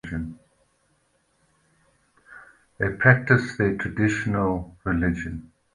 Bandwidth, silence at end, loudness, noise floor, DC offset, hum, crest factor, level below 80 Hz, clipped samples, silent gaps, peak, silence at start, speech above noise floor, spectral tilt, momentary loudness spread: 10.5 kHz; 0.35 s; -23 LUFS; -67 dBFS; under 0.1%; none; 24 dB; -44 dBFS; under 0.1%; none; -2 dBFS; 0.05 s; 44 dB; -7.5 dB/octave; 15 LU